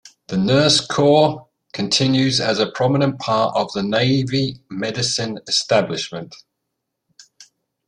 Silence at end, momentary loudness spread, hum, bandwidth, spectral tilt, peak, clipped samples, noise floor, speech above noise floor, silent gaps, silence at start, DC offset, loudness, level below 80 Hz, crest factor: 0.45 s; 12 LU; none; 10.5 kHz; -4.5 dB/octave; -2 dBFS; under 0.1%; -78 dBFS; 59 dB; none; 0.05 s; under 0.1%; -18 LUFS; -56 dBFS; 18 dB